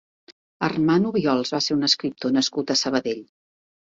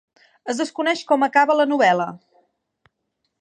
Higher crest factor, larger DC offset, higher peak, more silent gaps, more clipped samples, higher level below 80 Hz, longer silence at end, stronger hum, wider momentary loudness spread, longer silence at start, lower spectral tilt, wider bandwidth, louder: about the same, 18 dB vs 20 dB; neither; second, -6 dBFS vs -2 dBFS; first, 0.32-0.60 s vs none; neither; first, -62 dBFS vs -78 dBFS; second, 0.7 s vs 1.25 s; neither; second, 7 LU vs 12 LU; second, 0.3 s vs 0.45 s; about the same, -4 dB/octave vs -4 dB/octave; second, 7.8 kHz vs 11 kHz; second, -22 LUFS vs -19 LUFS